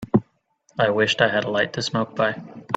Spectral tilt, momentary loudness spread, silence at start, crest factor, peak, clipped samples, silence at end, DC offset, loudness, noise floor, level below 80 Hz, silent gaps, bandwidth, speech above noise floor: -5 dB/octave; 6 LU; 0 s; 20 dB; -2 dBFS; under 0.1%; 0 s; under 0.1%; -22 LUFS; -63 dBFS; -58 dBFS; none; 9 kHz; 41 dB